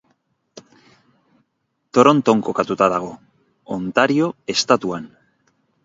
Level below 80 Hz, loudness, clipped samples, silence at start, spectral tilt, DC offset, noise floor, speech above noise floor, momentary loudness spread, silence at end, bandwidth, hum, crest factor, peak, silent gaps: -62 dBFS; -18 LUFS; under 0.1%; 0.55 s; -5 dB/octave; under 0.1%; -72 dBFS; 55 dB; 16 LU; 0.75 s; 7.8 kHz; none; 20 dB; 0 dBFS; none